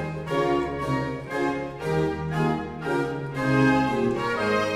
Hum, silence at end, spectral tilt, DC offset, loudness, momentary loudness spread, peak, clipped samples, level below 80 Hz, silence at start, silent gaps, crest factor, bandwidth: none; 0 s; -6.5 dB/octave; under 0.1%; -25 LUFS; 7 LU; -10 dBFS; under 0.1%; -48 dBFS; 0 s; none; 16 dB; 14 kHz